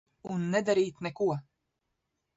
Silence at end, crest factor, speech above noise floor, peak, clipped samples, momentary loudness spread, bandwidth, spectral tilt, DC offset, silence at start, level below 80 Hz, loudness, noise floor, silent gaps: 0.95 s; 18 dB; 53 dB; -14 dBFS; under 0.1%; 10 LU; 8 kHz; -6 dB/octave; under 0.1%; 0.25 s; -72 dBFS; -31 LUFS; -82 dBFS; none